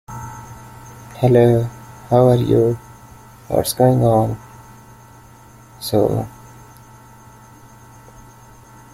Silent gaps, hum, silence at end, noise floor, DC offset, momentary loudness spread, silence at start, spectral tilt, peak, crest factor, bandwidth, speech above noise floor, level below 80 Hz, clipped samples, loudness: none; none; 2.65 s; -44 dBFS; under 0.1%; 24 LU; 0.1 s; -7 dB/octave; -2 dBFS; 18 dB; 15.5 kHz; 29 dB; -46 dBFS; under 0.1%; -17 LUFS